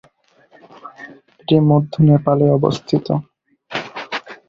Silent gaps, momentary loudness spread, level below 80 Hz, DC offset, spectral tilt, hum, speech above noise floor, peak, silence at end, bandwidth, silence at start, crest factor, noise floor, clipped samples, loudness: none; 22 LU; -52 dBFS; under 0.1%; -8.5 dB/octave; none; 40 dB; -2 dBFS; 0.15 s; 7.2 kHz; 0.85 s; 16 dB; -54 dBFS; under 0.1%; -17 LUFS